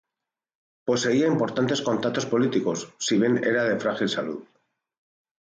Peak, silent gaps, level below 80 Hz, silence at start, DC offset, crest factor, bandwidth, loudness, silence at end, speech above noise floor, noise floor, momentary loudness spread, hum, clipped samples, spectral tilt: -10 dBFS; none; -68 dBFS; 0.85 s; under 0.1%; 14 dB; 9.4 kHz; -24 LUFS; 1.1 s; 64 dB; -88 dBFS; 8 LU; none; under 0.1%; -4.5 dB/octave